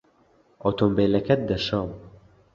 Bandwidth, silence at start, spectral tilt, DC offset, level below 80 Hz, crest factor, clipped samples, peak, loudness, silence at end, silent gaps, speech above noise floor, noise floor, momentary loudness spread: 7.4 kHz; 0.65 s; -7.5 dB/octave; under 0.1%; -48 dBFS; 20 dB; under 0.1%; -6 dBFS; -24 LUFS; 0.45 s; none; 38 dB; -61 dBFS; 11 LU